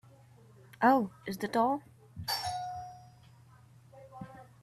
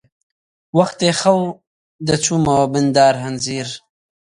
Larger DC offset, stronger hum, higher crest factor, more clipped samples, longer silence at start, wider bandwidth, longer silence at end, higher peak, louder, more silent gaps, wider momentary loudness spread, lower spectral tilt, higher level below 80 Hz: neither; neither; about the same, 22 dB vs 18 dB; neither; about the same, 0.8 s vs 0.75 s; first, 14.5 kHz vs 11.5 kHz; second, 0.2 s vs 0.45 s; second, -12 dBFS vs 0 dBFS; second, -32 LUFS vs -17 LUFS; second, none vs 1.67-1.99 s; first, 23 LU vs 12 LU; about the same, -4.5 dB/octave vs -4.5 dB/octave; second, -68 dBFS vs -50 dBFS